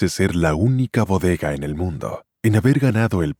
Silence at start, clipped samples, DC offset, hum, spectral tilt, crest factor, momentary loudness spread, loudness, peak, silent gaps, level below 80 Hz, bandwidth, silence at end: 0 s; under 0.1%; under 0.1%; none; -7 dB/octave; 14 dB; 9 LU; -19 LUFS; -4 dBFS; none; -38 dBFS; 16.5 kHz; 0.05 s